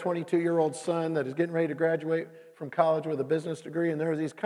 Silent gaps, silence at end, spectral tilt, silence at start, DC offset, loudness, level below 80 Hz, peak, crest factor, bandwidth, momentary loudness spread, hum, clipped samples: none; 0 s; -7 dB/octave; 0 s; under 0.1%; -29 LUFS; -86 dBFS; -10 dBFS; 18 dB; 11.5 kHz; 6 LU; none; under 0.1%